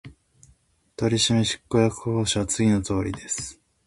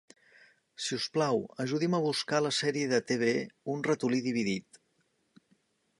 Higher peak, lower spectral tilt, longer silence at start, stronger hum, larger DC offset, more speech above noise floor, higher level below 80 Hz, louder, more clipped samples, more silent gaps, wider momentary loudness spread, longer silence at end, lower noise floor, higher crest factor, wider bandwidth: first, -6 dBFS vs -12 dBFS; about the same, -4.5 dB/octave vs -4.5 dB/octave; second, 0.05 s vs 0.8 s; neither; neither; second, 38 dB vs 44 dB; first, -46 dBFS vs -76 dBFS; first, -23 LUFS vs -31 LUFS; neither; neither; first, 9 LU vs 5 LU; second, 0.35 s vs 1.4 s; second, -61 dBFS vs -74 dBFS; about the same, 18 dB vs 20 dB; about the same, 11.5 kHz vs 11.5 kHz